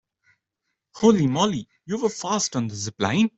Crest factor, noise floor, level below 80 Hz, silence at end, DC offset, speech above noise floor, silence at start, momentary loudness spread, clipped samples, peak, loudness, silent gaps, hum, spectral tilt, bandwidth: 20 dB; -80 dBFS; -60 dBFS; 0.1 s; under 0.1%; 58 dB; 0.95 s; 10 LU; under 0.1%; -4 dBFS; -23 LUFS; none; none; -5 dB/octave; 8.2 kHz